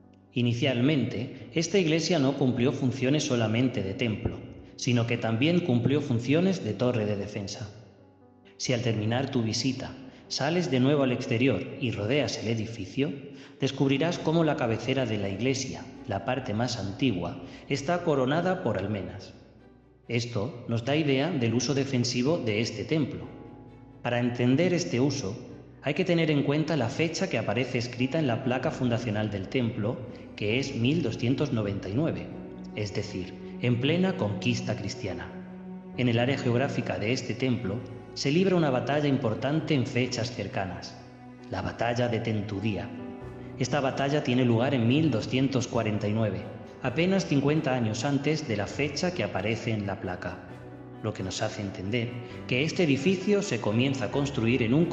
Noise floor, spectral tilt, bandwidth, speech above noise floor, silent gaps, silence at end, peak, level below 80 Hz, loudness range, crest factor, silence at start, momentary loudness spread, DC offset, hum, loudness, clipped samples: -56 dBFS; -6 dB/octave; 8.4 kHz; 28 dB; none; 0 s; -10 dBFS; -58 dBFS; 4 LU; 18 dB; 0.35 s; 12 LU; under 0.1%; none; -28 LUFS; under 0.1%